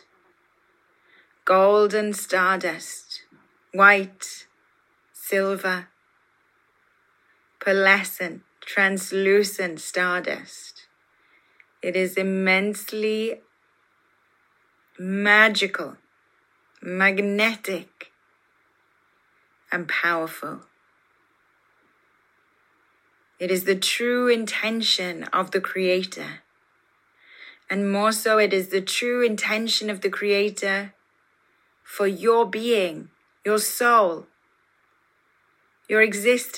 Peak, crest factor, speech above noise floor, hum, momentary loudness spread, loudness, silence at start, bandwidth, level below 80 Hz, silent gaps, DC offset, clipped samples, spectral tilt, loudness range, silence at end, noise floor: -2 dBFS; 22 dB; 43 dB; none; 18 LU; -22 LUFS; 1.45 s; 16.5 kHz; -84 dBFS; none; under 0.1%; under 0.1%; -3.5 dB/octave; 8 LU; 0 s; -65 dBFS